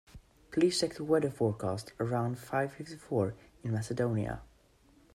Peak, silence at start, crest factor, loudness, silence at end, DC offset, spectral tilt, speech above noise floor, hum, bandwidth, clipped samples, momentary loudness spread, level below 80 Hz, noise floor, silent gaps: -16 dBFS; 0.15 s; 18 dB; -33 LUFS; 0.7 s; under 0.1%; -6 dB/octave; 32 dB; none; 14.5 kHz; under 0.1%; 9 LU; -60 dBFS; -64 dBFS; none